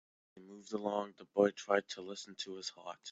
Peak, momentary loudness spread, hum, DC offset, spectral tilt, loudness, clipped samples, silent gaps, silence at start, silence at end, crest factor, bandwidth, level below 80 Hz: -16 dBFS; 15 LU; none; under 0.1%; -4 dB/octave; -37 LUFS; under 0.1%; none; 0.35 s; 0 s; 22 dB; 8 kHz; -86 dBFS